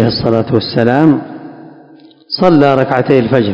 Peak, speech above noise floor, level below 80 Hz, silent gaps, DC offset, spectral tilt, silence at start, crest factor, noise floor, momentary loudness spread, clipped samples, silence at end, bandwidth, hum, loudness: 0 dBFS; 30 dB; -44 dBFS; none; under 0.1%; -8.5 dB/octave; 0 s; 12 dB; -40 dBFS; 11 LU; 1%; 0 s; 8 kHz; none; -11 LUFS